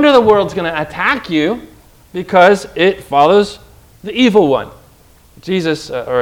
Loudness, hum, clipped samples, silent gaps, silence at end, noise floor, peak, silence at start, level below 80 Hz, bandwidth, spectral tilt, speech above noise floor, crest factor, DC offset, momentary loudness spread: -13 LUFS; none; 0.3%; none; 0 s; -46 dBFS; 0 dBFS; 0 s; -46 dBFS; 16.5 kHz; -5.5 dB/octave; 33 dB; 14 dB; under 0.1%; 16 LU